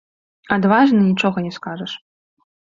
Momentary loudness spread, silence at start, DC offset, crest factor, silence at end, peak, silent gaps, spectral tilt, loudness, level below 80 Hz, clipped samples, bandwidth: 16 LU; 0.5 s; under 0.1%; 18 dB; 0.8 s; -2 dBFS; none; -7 dB/octave; -17 LUFS; -58 dBFS; under 0.1%; 7.4 kHz